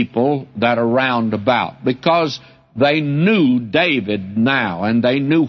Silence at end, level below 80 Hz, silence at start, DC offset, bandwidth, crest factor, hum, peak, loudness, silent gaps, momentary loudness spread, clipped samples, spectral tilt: 0 s; -58 dBFS; 0 s; under 0.1%; 6.4 kHz; 14 dB; none; -2 dBFS; -17 LUFS; none; 4 LU; under 0.1%; -7.5 dB/octave